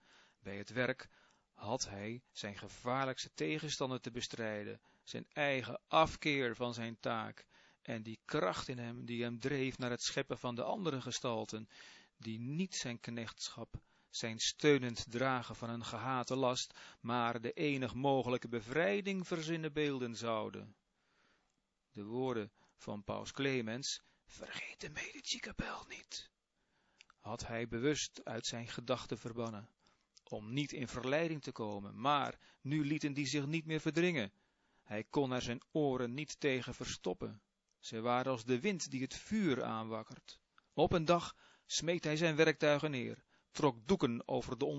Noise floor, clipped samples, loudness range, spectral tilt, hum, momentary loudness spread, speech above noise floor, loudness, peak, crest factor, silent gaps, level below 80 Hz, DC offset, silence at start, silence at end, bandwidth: -83 dBFS; under 0.1%; 6 LU; -4 dB/octave; none; 14 LU; 44 dB; -38 LUFS; -16 dBFS; 24 dB; none; -66 dBFS; under 0.1%; 0.45 s; 0 s; 7.6 kHz